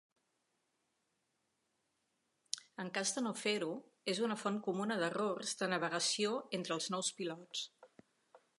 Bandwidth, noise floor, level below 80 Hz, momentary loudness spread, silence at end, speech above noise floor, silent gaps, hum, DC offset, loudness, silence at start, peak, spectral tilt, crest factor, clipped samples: 11.5 kHz; -83 dBFS; under -90 dBFS; 9 LU; 0.2 s; 45 dB; none; none; under 0.1%; -38 LUFS; 2.55 s; -14 dBFS; -3 dB/octave; 26 dB; under 0.1%